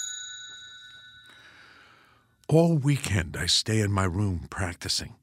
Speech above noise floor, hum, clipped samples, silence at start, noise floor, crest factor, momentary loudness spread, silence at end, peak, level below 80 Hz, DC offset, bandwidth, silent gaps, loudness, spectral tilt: 36 dB; none; under 0.1%; 0 s; -61 dBFS; 20 dB; 22 LU; 0.1 s; -8 dBFS; -48 dBFS; under 0.1%; 16 kHz; none; -26 LUFS; -4.5 dB/octave